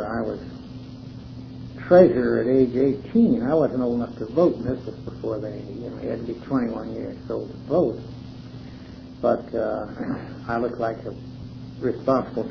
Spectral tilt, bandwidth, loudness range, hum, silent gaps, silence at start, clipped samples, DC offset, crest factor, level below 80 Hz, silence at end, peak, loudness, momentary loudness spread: -9.5 dB/octave; 5.4 kHz; 8 LU; none; none; 0 s; under 0.1%; under 0.1%; 22 dB; -48 dBFS; 0 s; -2 dBFS; -23 LUFS; 19 LU